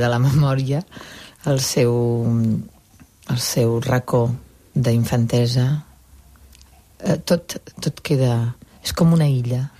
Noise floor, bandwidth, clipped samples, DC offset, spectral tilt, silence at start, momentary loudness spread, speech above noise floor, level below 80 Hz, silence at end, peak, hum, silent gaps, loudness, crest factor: -50 dBFS; 15.5 kHz; under 0.1%; under 0.1%; -6 dB/octave; 0 s; 11 LU; 31 dB; -46 dBFS; 0.1 s; -6 dBFS; none; none; -20 LUFS; 14 dB